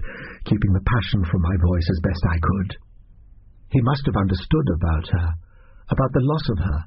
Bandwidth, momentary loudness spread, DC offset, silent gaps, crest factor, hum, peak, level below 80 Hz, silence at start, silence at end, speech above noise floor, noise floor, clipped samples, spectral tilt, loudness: 5.8 kHz; 7 LU; under 0.1%; none; 14 dB; none; -6 dBFS; -30 dBFS; 0 s; 0 s; 27 dB; -47 dBFS; under 0.1%; -7 dB/octave; -22 LUFS